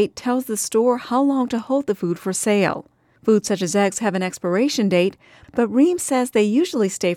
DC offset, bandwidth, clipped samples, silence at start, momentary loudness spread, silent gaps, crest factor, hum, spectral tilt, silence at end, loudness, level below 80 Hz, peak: under 0.1%; 17 kHz; under 0.1%; 0 s; 6 LU; none; 14 dB; none; -4.5 dB/octave; 0 s; -20 LUFS; -62 dBFS; -6 dBFS